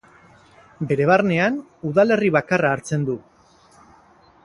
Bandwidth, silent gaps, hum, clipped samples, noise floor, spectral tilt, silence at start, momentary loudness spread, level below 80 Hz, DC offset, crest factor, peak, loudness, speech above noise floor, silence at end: 11.5 kHz; none; none; under 0.1%; -53 dBFS; -6.5 dB/octave; 0.8 s; 11 LU; -58 dBFS; under 0.1%; 20 dB; -2 dBFS; -20 LUFS; 34 dB; 1.25 s